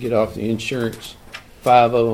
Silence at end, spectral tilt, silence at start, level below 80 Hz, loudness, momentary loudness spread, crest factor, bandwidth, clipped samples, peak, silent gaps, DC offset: 0 s; -6 dB/octave; 0 s; -46 dBFS; -18 LUFS; 22 LU; 18 dB; 16 kHz; under 0.1%; -2 dBFS; none; under 0.1%